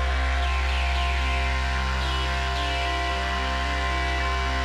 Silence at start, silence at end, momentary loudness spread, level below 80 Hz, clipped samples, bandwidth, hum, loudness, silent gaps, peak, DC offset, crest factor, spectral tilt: 0 s; 0 s; 1 LU; -26 dBFS; under 0.1%; 11 kHz; none; -25 LUFS; none; -14 dBFS; under 0.1%; 10 dB; -4.5 dB/octave